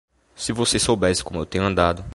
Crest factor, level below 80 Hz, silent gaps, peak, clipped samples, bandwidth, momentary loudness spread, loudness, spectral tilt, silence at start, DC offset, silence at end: 20 dB; -38 dBFS; none; -2 dBFS; under 0.1%; 11.5 kHz; 9 LU; -21 LUFS; -4 dB/octave; 0.4 s; under 0.1%; 0 s